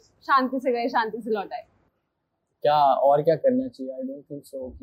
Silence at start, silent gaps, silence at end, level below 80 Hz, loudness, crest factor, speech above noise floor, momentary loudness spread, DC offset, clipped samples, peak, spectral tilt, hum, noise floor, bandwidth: 0.3 s; none; 0.05 s; -62 dBFS; -23 LUFS; 16 dB; 53 dB; 17 LU; under 0.1%; under 0.1%; -8 dBFS; -7 dB/octave; none; -77 dBFS; 15 kHz